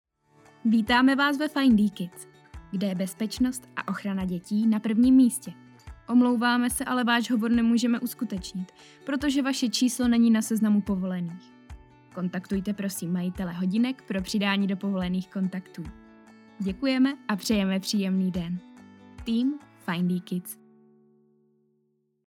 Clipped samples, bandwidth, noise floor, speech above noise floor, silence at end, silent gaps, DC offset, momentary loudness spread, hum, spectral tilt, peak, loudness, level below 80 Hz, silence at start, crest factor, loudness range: under 0.1%; 17 kHz; -72 dBFS; 47 dB; 1.7 s; none; under 0.1%; 16 LU; none; -5 dB/octave; -8 dBFS; -26 LUFS; -54 dBFS; 0.65 s; 18 dB; 6 LU